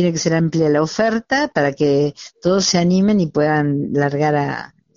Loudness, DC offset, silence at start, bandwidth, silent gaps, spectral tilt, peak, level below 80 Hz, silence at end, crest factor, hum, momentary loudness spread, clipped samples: -17 LUFS; under 0.1%; 0 s; 7.4 kHz; none; -5 dB/octave; -2 dBFS; -52 dBFS; 0.3 s; 14 dB; none; 5 LU; under 0.1%